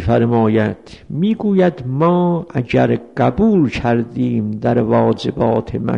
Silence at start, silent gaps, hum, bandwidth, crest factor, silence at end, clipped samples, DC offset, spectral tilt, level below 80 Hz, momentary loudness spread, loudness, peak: 0 s; none; none; 7.6 kHz; 12 dB; 0 s; under 0.1%; 0.2%; -9 dB/octave; -40 dBFS; 5 LU; -16 LUFS; -2 dBFS